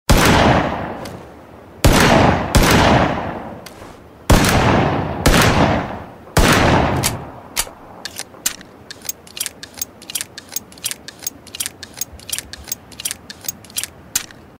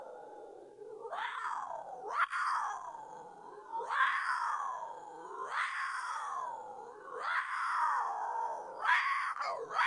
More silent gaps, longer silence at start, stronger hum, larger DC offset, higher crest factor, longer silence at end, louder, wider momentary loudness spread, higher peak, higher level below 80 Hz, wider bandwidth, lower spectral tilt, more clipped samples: neither; about the same, 0.1 s vs 0 s; neither; neither; about the same, 18 dB vs 22 dB; first, 0.35 s vs 0 s; first, -17 LUFS vs -36 LUFS; about the same, 18 LU vs 19 LU; first, 0 dBFS vs -16 dBFS; first, -26 dBFS vs -84 dBFS; first, 16.5 kHz vs 11 kHz; first, -4 dB/octave vs -0.5 dB/octave; neither